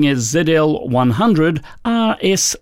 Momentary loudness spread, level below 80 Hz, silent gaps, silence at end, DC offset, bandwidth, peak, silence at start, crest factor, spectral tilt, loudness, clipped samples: 4 LU; -46 dBFS; none; 0.05 s; under 0.1%; 16.5 kHz; -4 dBFS; 0 s; 12 dB; -4.5 dB/octave; -16 LUFS; under 0.1%